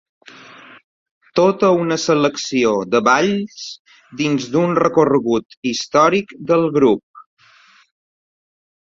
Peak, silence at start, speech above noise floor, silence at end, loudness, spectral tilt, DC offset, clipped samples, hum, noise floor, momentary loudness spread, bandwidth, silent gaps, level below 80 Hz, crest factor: 0 dBFS; 1.35 s; 34 dB; 1.6 s; -16 LUFS; -5 dB/octave; under 0.1%; under 0.1%; none; -50 dBFS; 9 LU; 7.8 kHz; 3.79-3.85 s, 5.45-5.49 s, 5.57-5.63 s, 7.03-7.14 s; -58 dBFS; 18 dB